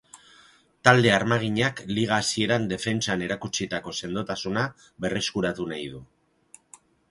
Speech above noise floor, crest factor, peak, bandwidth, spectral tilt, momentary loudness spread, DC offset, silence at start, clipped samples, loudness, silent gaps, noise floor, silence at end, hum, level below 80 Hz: 32 dB; 26 dB; 0 dBFS; 11.5 kHz; -4.5 dB/octave; 12 LU; under 0.1%; 0.15 s; under 0.1%; -25 LUFS; none; -57 dBFS; 1.05 s; none; -56 dBFS